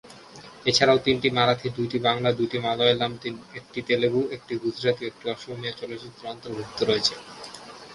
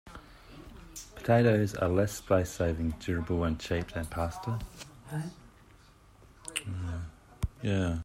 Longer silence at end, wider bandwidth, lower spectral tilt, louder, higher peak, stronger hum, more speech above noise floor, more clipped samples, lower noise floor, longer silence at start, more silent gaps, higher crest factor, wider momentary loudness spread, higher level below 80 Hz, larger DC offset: about the same, 0 s vs 0 s; second, 11.5 kHz vs 16 kHz; second, -4.5 dB/octave vs -6 dB/octave; first, -24 LUFS vs -31 LUFS; first, -4 dBFS vs -12 dBFS; neither; second, 21 dB vs 28 dB; neither; second, -46 dBFS vs -58 dBFS; about the same, 0.05 s vs 0.05 s; neither; about the same, 22 dB vs 20 dB; about the same, 18 LU vs 20 LU; second, -60 dBFS vs -48 dBFS; neither